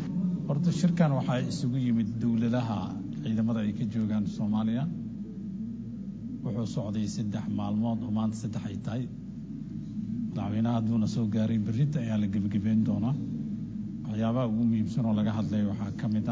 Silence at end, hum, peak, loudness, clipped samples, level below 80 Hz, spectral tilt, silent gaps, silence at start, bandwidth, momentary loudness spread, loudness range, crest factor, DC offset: 0 s; none; -10 dBFS; -30 LUFS; under 0.1%; -54 dBFS; -8 dB/octave; none; 0 s; 8 kHz; 10 LU; 5 LU; 18 dB; under 0.1%